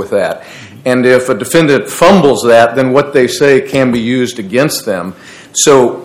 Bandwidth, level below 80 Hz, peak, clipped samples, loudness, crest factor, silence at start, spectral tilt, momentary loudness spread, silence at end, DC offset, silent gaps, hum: 16.5 kHz; -46 dBFS; 0 dBFS; 3%; -10 LUFS; 10 dB; 0 s; -4.5 dB/octave; 11 LU; 0 s; under 0.1%; none; none